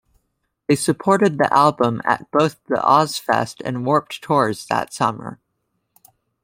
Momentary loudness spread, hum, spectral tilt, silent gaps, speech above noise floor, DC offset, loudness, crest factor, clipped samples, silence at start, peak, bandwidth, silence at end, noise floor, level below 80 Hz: 8 LU; none; -5 dB/octave; none; 54 dB; under 0.1%; -19 LUFS; 18 dB; under 0.1%; 0.7 s; -2 dBFS; 16.5 kHz; 1.1 s; -73 dBFS; -60 dBFS